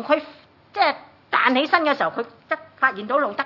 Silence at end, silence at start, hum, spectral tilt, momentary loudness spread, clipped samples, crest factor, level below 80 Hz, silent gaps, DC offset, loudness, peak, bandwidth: 0 s; 0 s; none; -5 dB/octave; 11 LU; under 0.1%; 22 dB; -76 dBFS; none; under 0.1%; -21 LUFS; -2 dBFS; 6 kHz